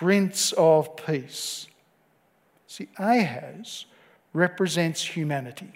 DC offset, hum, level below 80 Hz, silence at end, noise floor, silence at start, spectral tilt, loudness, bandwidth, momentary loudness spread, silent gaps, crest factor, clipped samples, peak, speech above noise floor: under 0.1%; none; -76 dBFS; 0.05 s; -65 dBFS; 0 s; -4.5 dB/octave; -24 LUFS; 16 kHz; 19 LU; none; 20 dB; under 0.1%; -6 dBFS; 40 dB